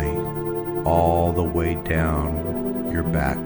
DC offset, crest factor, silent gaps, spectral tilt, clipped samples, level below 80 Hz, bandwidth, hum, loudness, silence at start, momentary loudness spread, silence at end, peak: under 0.1%; 16 dB; none; -8.5 dB/octave; under 0.1%; -32 dBFS; over 20 kHz; none; -23 LUFS; 0 s; 7 LU; 0 s; -6 dBFS